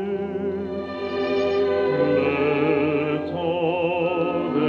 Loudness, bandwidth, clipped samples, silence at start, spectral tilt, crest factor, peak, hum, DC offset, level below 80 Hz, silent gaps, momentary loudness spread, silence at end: -23 LUFS; 7 kHz; under 0.1%; 0 s; -8 dB/octave; 14 dB; -10 dBFS; none; under 0.1%; -56 dBFS; none; 7 LU; 0 s